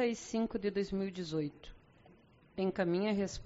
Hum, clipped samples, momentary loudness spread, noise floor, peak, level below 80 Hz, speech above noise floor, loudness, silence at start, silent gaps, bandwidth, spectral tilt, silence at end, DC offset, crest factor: none; under 0.1%; 8 LU; -63 dBFS; -20 dBFS; -60 dBFS; 27 dB; -36 LUFS; 0 s; none; 8 kHz; -5.5 dB/octave; 0 s; under 0.1%; 18 dB